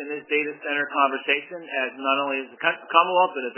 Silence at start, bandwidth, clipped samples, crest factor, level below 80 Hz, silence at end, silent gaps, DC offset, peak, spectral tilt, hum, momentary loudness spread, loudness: 0 s; 3.2 kHz; under 0.1%; 22 dB; under -90 dBFS; 0.05 s; none; under 0.1%; -2 dBFS; -6.5 dB/octave; none; 8 LU; -23 LUFS